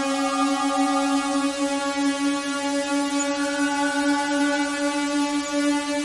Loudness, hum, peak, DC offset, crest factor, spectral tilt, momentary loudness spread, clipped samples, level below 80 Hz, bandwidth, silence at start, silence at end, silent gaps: -23 LUFS; none; -10 dBFS; under 0.1%; 12 dB; -1.5 dB/octave; 2 LU; under 0.1%; -60 dBFS; 11.5 kHz; 0 s; 0 s; none